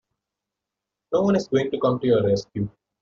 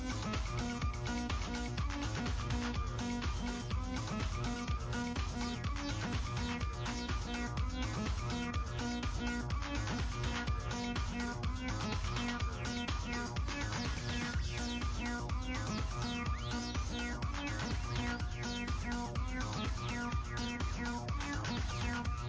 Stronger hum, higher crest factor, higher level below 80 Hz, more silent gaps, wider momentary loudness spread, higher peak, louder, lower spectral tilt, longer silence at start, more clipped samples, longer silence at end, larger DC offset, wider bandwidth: neither; about the same, 16 dB vs 12 dB; second, -56 dBFS vs -42 dBFS; neither; first, 10 LU vs 2 LU; first, -8 dBFS vs -24 dBFS; first, -23 LUFS vs -39 LUFS; first, -6.5 dB/octave vs -5 dB/octave; first, 1.1 s vs 0 s; neither; first, 0.35 s vs 0 s; neither; about the same, 7.6 kHz vs 8 kHz